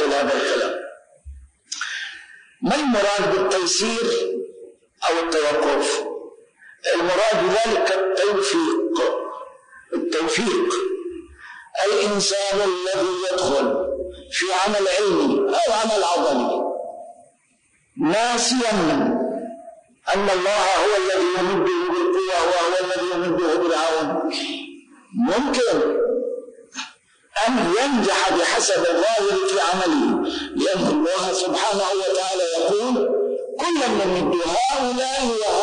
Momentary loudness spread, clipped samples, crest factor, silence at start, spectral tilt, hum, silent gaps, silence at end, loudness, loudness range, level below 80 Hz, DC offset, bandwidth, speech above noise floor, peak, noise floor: 12 LU; under 0.1%; 10 dB; 0 s; -3 dB/octave; none; none; 0 s; -20 LUFS; 3 LU; -54 dBFS; under 0.1%; 10.5 kHz; 42 dB; -10 dBFS; -62 dBFS